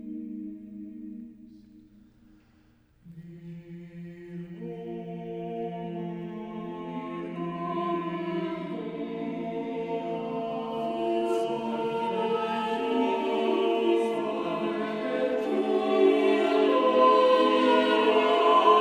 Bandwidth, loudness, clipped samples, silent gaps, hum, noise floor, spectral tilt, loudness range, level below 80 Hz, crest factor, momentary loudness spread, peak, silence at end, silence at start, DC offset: 10.5 kHz; -27 LUFS; under 0.1%; none; none; -61 dBFS; -6 dB/octave; 22 LU; -68 dBFS; 20 dB; 20 LU; -8 dBFS; 0 s; 0 s; under 0.1%